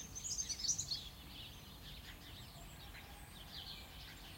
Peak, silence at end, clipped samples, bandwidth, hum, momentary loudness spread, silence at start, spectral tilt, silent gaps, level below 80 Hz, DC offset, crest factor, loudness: -26 dBFS; 0 s; under 0.1%; 16.5 kHz; none; 16 LU; 0 s; -1 dB/octave; none; -60 dBFS; under 0.1%; 22 dB; -45 LUFS